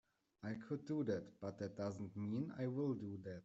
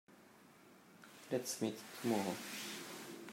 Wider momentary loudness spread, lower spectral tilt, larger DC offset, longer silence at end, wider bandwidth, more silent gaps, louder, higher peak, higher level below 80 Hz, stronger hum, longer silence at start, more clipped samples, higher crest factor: second, 8 LU vs 24 LU; first, -8 dB/octave vs -4 dB/octave; neither; about the same, 0 s vs 0 s; second, 8 kHz vs 16 kHz; neither; second, -45 LUFS vs -42 LUFS; second, -28 dBFS vs -24 dBFS; first, -80 dBFS vs -90 dBFS; neither; first, 0.4 s vs 0.1 s; neither; about the same, 16 dB vs 20 dB